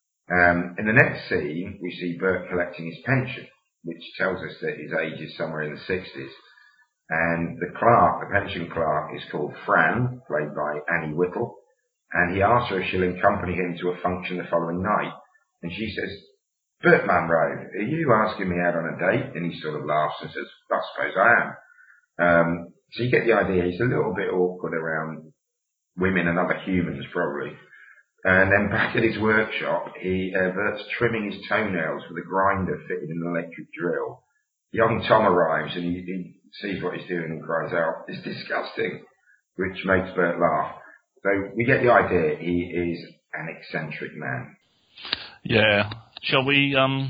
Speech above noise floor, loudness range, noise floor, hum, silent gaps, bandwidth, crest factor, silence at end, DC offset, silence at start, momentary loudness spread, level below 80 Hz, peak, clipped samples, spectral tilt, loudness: 57 dB; 6 LU; -81 dBFS; none; none; 5.2 kHz; 24 dB; 0 s; under 0.1%; 0.3 s; 14 LU; -56 dBFS; 0 dBFS; under 0.1%; -8.5 dB/octave; -24 LUFS